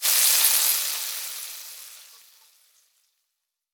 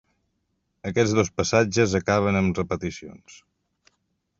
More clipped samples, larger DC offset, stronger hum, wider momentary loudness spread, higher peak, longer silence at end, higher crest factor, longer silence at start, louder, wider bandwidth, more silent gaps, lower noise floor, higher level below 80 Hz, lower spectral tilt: neither; neither; neither; first, 23 LU vs 14 LU; first, -2 dBFS vs -6 dBFS; first, 1.7 s vs 1.05 s; about the same, 24 dB vs 20 dB; second, 0 s vs 0.85 s; first, -19 LUFS vs -23 LUFS; first, over 20 kHz vs 7.8 kHz; neither; first, -81 dBFS vs -74 dBFS; second, -78 dBFS vs -56 dBFS; second, 5 dB/octave vs -5.5 dB/octave